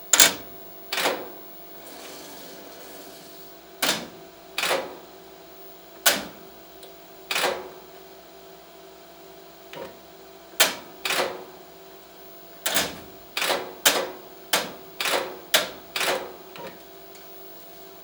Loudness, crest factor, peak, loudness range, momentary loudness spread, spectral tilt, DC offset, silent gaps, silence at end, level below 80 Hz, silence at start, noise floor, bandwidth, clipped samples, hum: -24 LUFS; 30 dB; 0 dBFS; 8 LU; 24 LU; 0 dB/octave; under 0.1%; none; 0 s; -64 dBFS; 0 s; -46 dBFS; over 20 kHz; under 0.1%; none